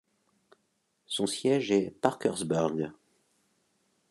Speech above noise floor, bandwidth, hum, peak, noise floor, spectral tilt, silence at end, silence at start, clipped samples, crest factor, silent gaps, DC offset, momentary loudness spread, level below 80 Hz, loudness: 47 dB; 12.5 kHz; none; -6 dBFS; -76 dBFS; -5 dB/octave; 1.15 s; 1.1 s; under 0.1%; 24 dB; none; under 0.1%; 9 LU; -72 dBFS; -30 LUFS